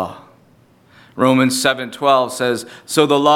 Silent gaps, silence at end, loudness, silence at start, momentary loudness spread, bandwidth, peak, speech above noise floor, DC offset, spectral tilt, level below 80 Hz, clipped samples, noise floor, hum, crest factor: none; 0 s; -16 LUFS; 0 s; 10 LU; 17 kHz; 0 dBFS; 36 dB; under 0.1%; -4 dB/octave; -64 dBFS; under 0.1%; -51 dBFS; none; 18 dB